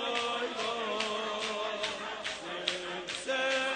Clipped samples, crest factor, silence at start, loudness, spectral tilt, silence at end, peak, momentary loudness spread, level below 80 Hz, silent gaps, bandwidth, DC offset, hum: under 0.1%; 22 dB; 0 s; -33 LUFS; -1.5 dB/octave; 0 s; -12 dBFS; 6 LU; -70 dBFS; none; 9.6 kHz; under 0.1%; none